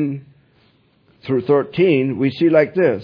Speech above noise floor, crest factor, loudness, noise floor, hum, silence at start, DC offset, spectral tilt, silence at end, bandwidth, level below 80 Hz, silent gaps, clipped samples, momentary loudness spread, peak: 40 dB; 16 dB; -17 LUFS; -57 dBFS; none; 0 s; under 0.1%; -9.5 dB/octave; 0 s; 5.2 kHz; -60 dBFS; none; under 0.1%; 11 LU; -2 dBFS